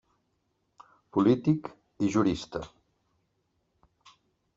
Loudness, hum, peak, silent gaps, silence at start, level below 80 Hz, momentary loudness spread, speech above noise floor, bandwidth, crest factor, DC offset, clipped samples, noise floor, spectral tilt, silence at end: -28 LUFS; none; -12 dBFS; none; 1.15 s; -60 dBFS; 17 LU; 50 dB; 7.8 kHz; 20 dB; under 0.1%; under 0.1%; -76 dBFS; -7 dB/octave; 1.9 s